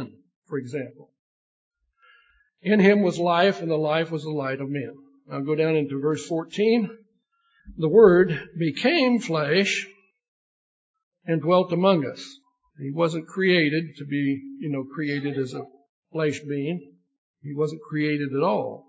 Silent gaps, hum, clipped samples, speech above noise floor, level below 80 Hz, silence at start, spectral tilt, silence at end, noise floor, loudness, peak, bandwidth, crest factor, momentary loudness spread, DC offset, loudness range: 0.36-0.42 s, 1.19-1.71 s, 10.28-10.94 s, 11.03-11.12 s, 15.89-16.03 s, 17.18-17.34 s; none; under 0.1%; 46 dB; -62 dBFS; 0 s; -6.5 dB/octave; 0.1 s; -69 dBFS; -23 LUFS; -4 dBFS; 8 kHz; 20 dB; 15 LU; under 0.1%; 8 LU